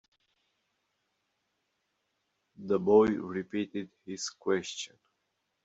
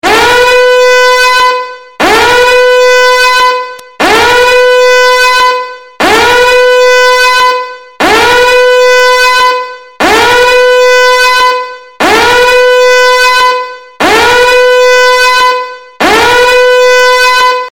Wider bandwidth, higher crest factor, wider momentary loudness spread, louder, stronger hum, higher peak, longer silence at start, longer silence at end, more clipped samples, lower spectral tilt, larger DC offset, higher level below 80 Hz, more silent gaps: second, 8 kHz vs 17.5 kHz; first, 22 dB vs 6 dB; first, 18 LU vs 7 LU; second, -30 LUFS vs -5 LUFS; neither; second, -12 dBFS vs 0 dBFS; first, 2.6 s vs 0.05 s; first, 0.8 s vs 0.05 s; second, under 0.1% vs 0.1%; first, -5 dB/octave vs -1.5 dB/octave; neither; second, -68 dBFS vs -34 dBFS; neither